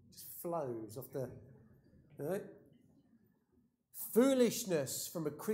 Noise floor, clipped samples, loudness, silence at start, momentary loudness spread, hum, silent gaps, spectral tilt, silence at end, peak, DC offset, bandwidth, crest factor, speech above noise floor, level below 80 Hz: -75 dBFS; under 0.1%; -37 LUFS; 0.15 s; 18 LU; none; none; -4.5 dB/octave; 0 s; -18 dBFS; under 0.1%; 16 kHz; 22 dB; 39 dB; -78 dBFS